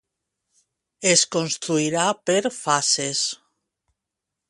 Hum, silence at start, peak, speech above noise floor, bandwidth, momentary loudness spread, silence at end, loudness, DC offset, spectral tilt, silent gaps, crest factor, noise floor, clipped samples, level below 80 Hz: none; 1 s; -2 dBFS; 62 dB; 11.5 kHz; 7 LU; 1.15 s; -21 LUFS; under 0.1%; -2.5 dB/octave; none; 22 dB; -84 dBFS; under 0.1%; -68 dBFS